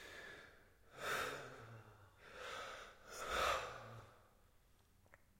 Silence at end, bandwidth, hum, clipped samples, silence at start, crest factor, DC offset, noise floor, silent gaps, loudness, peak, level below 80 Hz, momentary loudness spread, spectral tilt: 0.15 s; 16.5 kHz; none; under 0.1%; 0 s; 22 dB; under 0.1%; -71 dBFS; none; -45 LUFS; -26 dBFS; -68 dBFS; 23 LU; -2 dB/octave